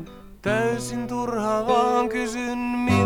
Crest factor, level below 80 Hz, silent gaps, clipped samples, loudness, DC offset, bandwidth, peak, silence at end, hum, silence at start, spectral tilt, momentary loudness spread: 18 dB; -48 dBFS; none; under 0.1%; -24 LUFS; under 0.1%; 19 kHz; -6 dBFS; 0 s; none; 0 s; -5.5 dB/octave; 8 LU